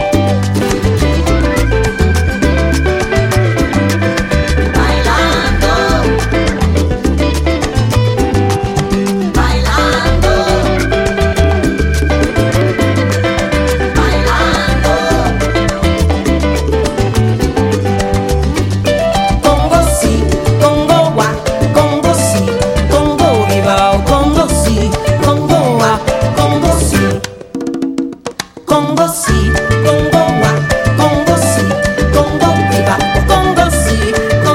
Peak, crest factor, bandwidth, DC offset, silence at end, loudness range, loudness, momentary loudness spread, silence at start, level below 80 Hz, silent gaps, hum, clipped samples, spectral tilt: 0 dBFS; 10 dB; 16.5 kHz; under 0.1%; 0 s; 2 LU; -12 LUFS; 3 LU; 0 s; -18 dBFS; none; none; under 0.1%; -5.5 dB/octave